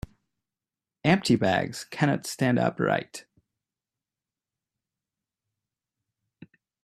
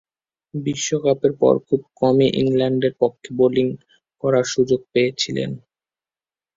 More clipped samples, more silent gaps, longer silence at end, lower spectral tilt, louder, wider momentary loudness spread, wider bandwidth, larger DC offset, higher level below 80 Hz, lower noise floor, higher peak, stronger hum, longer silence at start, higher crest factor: neither; neither; first, 3.65 s vs 1 s; about the same, -5.5 dB/octave vs -5.5 dB/octave; second, -25 LUFS vs -20 LUFS; first, 16 LU vs 9 LU; first, 14.5 kHz vs 7.8 kHz; neither; about the same, -60 dBFS vs -58 dBFS; about the same, under -90 dBFS vs under -90 dBFS; second, -6 dBFS vs -2 dBFS; neither; first, 1.05 s vs 0.55 s; first, 24 dB vs 18 dB